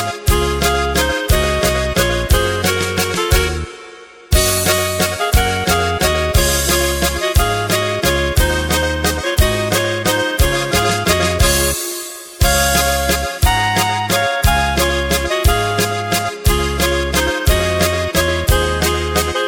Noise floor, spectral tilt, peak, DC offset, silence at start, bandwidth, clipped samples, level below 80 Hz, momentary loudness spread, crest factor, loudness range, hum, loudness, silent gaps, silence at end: -37 dBFS; -3.5 dB/octave; 0 dBFS; under 0.1%; 0 s; 17 kHz; under 0.1%; -22 dBFS; 3 LU; 16 dB; 1 LU; none; -15 LUFS; none; 0 s